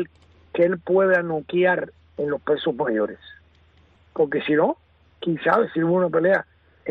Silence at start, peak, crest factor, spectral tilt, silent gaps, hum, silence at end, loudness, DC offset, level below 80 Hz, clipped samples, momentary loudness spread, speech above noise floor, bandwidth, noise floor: 0 s; -6 dBFS; 16 dB; -8.5 dB/octave; none; none; 0 s; -22 LUFS; under 0.1%; -60 dBFS; under 0.1%; 15 LU; 35 dB; 5.2 kHz; -56 dBFS